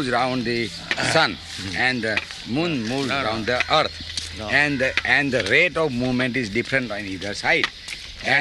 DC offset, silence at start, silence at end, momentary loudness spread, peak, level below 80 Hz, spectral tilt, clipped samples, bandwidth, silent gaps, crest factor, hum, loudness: under 0.1%; 0 s; 0 s; 10 LU; -2 dBFS; -48 dBFS; -4 dB/octave; under 0.1%; 12 kHz; none; 20 dB; none; -21 LUFS